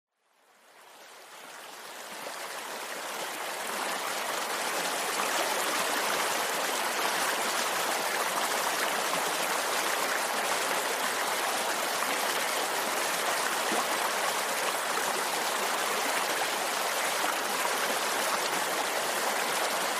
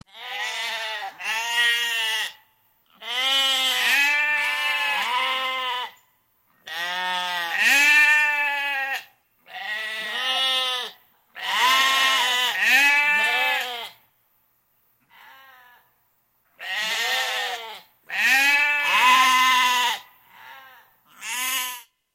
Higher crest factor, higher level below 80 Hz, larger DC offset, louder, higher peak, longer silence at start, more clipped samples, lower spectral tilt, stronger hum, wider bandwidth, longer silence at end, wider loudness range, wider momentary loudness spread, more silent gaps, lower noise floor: about the same, 18 dB vs 18 dB; about the same, -82 dBFS vs -78 dBFS; neither; second, -29 LUFS vs -20 LUFS; second, -12 dBFS vs -4 dBFS; first, 0.75 s vs 0.15 s; neither; first, 0 dB/octave vs 2 dB/octave; neither; about the same, 15.5 kHz vs 16.5 kHz; second, 0 s vs 0.35 s; second, 6 LU vs 9 LU; second, 8 LU vs 16 LU; neither; about the same, -65 dBFS vs -67 dBFS